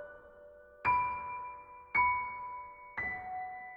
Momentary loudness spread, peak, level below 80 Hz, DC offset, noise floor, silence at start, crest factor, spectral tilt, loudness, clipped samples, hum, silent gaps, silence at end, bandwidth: 20 LU; -20 dBFS; -62 dBFS; under 0.1%; -56 dBFS; 0 s; 18 dB; -6.5 dB/octave; -35 LUFS; under 0.1%; none; none; 0 s; 5.2 kHz